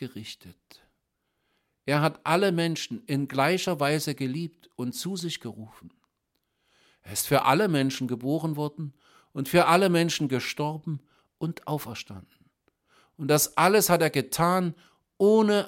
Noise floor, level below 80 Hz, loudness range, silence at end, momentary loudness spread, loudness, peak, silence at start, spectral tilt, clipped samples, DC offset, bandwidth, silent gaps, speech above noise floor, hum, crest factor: -78 dBFS; -64 dBFS; 7 LU; 0 s; 18 LU; -25 LUFS; -6 dBFS; 0 s; -4.5 dB/octave; under 0.1%; under 0.1%; 16.5 kHz; none; 52 dB; none; 22 dB